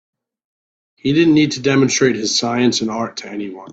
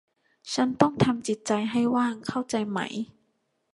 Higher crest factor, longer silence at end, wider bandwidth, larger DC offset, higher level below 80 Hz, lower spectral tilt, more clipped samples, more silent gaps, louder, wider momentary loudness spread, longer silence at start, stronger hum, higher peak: second, 16 dB vs 24 dB; second, 0 s vs 0.7 s; second, 8 kHz vs 11.5 kHz; neither; first, -56 dBFS vs -62 dBFS; second, -4 dB/octave vs -5.5 dB/octave; neither; neither; first, -16 LUFS vs -26 LUFS; about the same, 12 LU vs 11 LU; first, 1.05 s vs 0.45 s; neither; about the same, -2 dBFS vs -4 dBFS